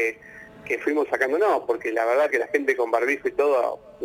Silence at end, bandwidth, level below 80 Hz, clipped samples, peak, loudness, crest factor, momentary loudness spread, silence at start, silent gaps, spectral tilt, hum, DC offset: 0 s; 16 kHz; -66 dBFS; under 0.1%; -8 dBFS; -23 LUFS; 16 dB; 8 LU; 0 s; none; -4 dB/octave; none; under 0.1%